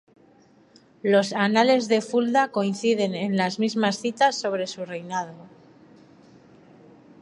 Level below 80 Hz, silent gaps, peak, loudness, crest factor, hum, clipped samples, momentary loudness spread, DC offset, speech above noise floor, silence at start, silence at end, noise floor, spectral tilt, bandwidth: -74 dBFS; none; -4 dBFS; -23 LUFS; 20 dB; none; under 0.1%; 11 LU; under 0.1%; 33 dB; 1.05 s; 1.75 s; -56 dBFS; -4.5 dB/octave; 11.5 kHz